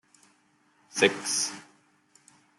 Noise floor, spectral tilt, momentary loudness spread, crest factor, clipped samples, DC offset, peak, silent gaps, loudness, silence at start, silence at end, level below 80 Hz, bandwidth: -66 dBFS; -1.5 dB/octave; 14 LU; 26 dB; under 0.1%; under 0.1%; -6 dBFS; none; -26 LUFS; 0.95 s; 0.95 s; -80 dBFS; 12.5 kHz